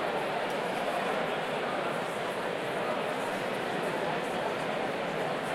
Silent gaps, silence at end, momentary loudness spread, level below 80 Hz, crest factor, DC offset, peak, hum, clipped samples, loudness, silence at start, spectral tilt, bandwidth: none; 0 s; 2 LU; -70 dBFS; 12 dB; under 0.1%; -18 dBFS; none; under 0.1%; -32 LUFS; 0 s; -4.5 dB/octave; 16.5 kHz